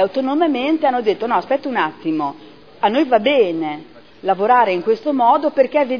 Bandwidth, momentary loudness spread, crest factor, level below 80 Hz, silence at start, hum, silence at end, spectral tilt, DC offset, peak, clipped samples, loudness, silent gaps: 5.4 kHz; 8 LU; 16 dB; -66 dBFS; 0 s; none; 0 s; -7 dB/octave; 0.4%; -2 dBFS; under 0.1%; -17 LUFS; none